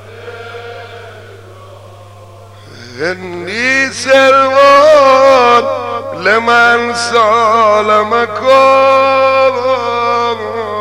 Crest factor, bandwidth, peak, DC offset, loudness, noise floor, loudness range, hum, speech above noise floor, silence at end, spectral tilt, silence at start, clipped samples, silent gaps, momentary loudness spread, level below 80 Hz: 10 dB; 12 kHz; 0 dBFS; 0.4%; -9 LUFS; -34 dBFS; 11 LU; 50 Hz at -35 dBFS; 25 dB; 0 s; -3.5 dB/octave; 0 s; 0.1%; none; 21 LU; -54 dBFS